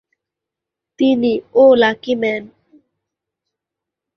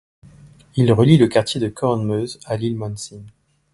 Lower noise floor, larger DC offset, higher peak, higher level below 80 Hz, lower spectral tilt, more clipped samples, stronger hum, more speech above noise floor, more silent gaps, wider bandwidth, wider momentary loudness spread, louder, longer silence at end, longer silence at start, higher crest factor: first, -84 dBFS vs -46 dBFS; neither; about the same, -2 dBFS vs 0 dBFS; second, -60 dBFS vs -50 dBFS; about the same, -6 dB/octave vs -7 dB/octave; neither; neither; first, 70 dB vs 29 dB; neither; second, 6.4 kHz vs 11.5 kHz; second, 9 LU vs 15 LU; first, -15 LUFS vs -18 LUFS; first, 1.7 s vs 0.45 s; first, 1 s vs 0.75 s; about the same, 16 dB vs 18 dB